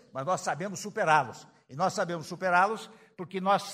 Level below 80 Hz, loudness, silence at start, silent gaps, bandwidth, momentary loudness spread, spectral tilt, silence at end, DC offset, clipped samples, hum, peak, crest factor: -78 dBFS; -29 LUFS; 0.15 s; none; 15.5 kHz; 18 LU; -4 dB/octave; 0 s; under 0.1%; under 0.1%; none; -8 dBFS; 22 dB